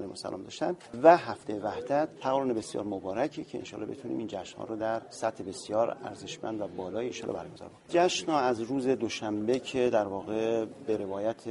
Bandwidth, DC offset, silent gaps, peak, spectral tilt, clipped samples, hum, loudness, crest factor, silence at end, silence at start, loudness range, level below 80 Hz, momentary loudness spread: 11.5 kHz; under 0.1%; none; -6 dBFS; -5 dB/octave; under 0.1%; none; -31 LUFS; 26 dB; 0 s; 0 s; 6 LU; -68 dBFS; 13 LU